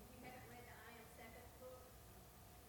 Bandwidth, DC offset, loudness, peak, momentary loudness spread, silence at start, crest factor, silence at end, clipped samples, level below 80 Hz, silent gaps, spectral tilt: 19 kHz; under 0.1%; -59 LUFS; -44 dBFS; 4 LU; 0 s; 16 dB; 0 s; under 0.1%; -68 dBFS; none; -4 dB/octave